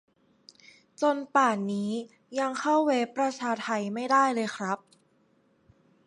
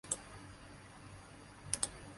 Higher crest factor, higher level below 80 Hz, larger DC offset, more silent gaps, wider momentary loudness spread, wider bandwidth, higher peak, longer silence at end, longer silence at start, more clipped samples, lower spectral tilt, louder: second, 20 dB vs 32 dB; second, -80 dBFS vs -62 dBFS; neither; neither; second, 10 LU vs 17 LU; about the same, 11.5 kHz vs 11.5 kHz; first, -10 dBFS vs -14 dBFS; first, 1.3 s vs 0 s; first, 1 s vs 0.05 s; neither; first, -4.5 dB/octave vs -1.5 dB/octave; first, -28 LUFS vs -41 LUFS